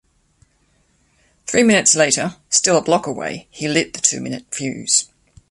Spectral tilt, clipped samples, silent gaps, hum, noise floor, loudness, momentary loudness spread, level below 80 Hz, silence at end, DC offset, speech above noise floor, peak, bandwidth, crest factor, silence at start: -2.5 dB/octave; under 0.1%; none; none; -61 dBFS; -17 LUFS; 14 LU; -58 dBFS; 0.45 s; under 0.1%; 43 dB; 0 dBFS; 11.5 kHz; 20 dB; 1.45 s